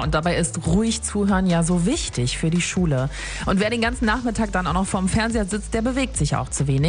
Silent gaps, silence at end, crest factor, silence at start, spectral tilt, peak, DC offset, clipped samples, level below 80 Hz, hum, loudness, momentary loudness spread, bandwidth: none; 0 s; 14 dB; 0 s; -5 dB/octave; -6 dBFS; under 0.1%; under 0.1%; -32 dBFS; none; -22 LUFS; 4 LU; 10 kHz